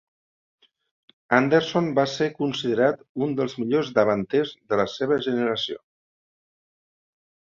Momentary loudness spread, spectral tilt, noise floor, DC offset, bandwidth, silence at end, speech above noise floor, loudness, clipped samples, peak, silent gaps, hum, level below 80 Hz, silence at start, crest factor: 6 LU; -6 dB/octave; under -90 dBFS; under 0.1%; 7.6 kHz; 1.8 s; over 67 dB; -23 LUFS; under 0.1%; -2 dBFS; 3.09-3.15 s; none; -64 dBFS; 1.3 s; 22 dB